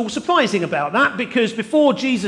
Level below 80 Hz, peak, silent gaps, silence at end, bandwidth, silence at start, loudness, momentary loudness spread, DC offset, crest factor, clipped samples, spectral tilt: -62 dBFS; -4 dBFS; none; 0 s; 11.5 kHz; 0 s; -18 LUFS; 3 LU; under 0.1%; 14 dB; under 0.1%; -4.5 dB/octave